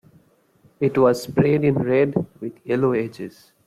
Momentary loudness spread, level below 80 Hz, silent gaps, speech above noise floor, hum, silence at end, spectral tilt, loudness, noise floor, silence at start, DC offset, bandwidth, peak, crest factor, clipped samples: 15 LU; -56 dBFS; none; 38 dB; none; 0.4 s; -7.5 dB/octave; -20 LUFS; -58 dBFS; 0.8 s; under 0.1%; 15 kHz; -6 dBFS; 16 dB; under 0.1%